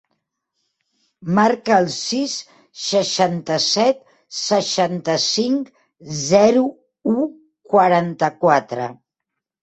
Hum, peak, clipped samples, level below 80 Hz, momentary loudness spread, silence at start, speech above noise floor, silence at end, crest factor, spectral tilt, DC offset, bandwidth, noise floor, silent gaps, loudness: none; -2 dBFS; under 0.1%; -62 dBFS; 13 LU; 1.2 s; 64 dB; 0.7 s; 18 dB; -4 dB/octave; under 0.1%; 8.4 kHz; -82 dBFS; none; -18 LUFS